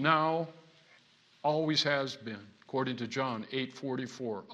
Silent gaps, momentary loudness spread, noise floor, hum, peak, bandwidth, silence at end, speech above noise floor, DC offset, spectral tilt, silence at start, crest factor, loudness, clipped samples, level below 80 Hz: none; 13 LU; -64 dBFS; none; -10 dBFS; 11 kHz; 0 s; 31 dB; under 0.1%; -5 dB/octave; 0 s; 22 dB; -33 LUFS; under 0.1%; -80 dBFS